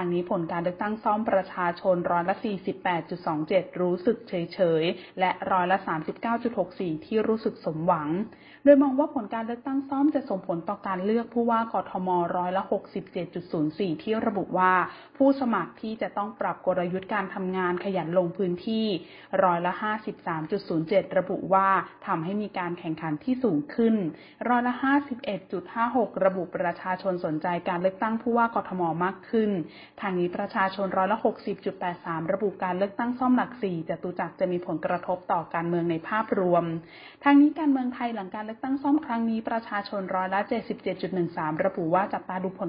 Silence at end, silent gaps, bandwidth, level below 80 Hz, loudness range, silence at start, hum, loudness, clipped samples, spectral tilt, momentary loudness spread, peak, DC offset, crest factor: 0 s; none; 5.2 kHz; -66 dBFS; 3 LU; 0 s; none; -27 LUFS; under 0.1%; -11 dB/octave; 8 LU; -6 dBFS; under 0.1%; 22 dB